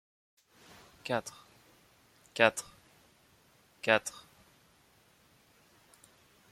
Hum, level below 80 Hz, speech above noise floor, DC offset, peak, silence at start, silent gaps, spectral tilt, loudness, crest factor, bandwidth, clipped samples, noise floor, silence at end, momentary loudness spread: none; -76 dBFS; 35 dB; under 0.1%; -8 dBFS; 1.05 s; none; -3 dB/octave; -31 LUFS; 30 dB; 16 kHz; under 0.1%; -66 dBFS; 2.4 s; 28 LU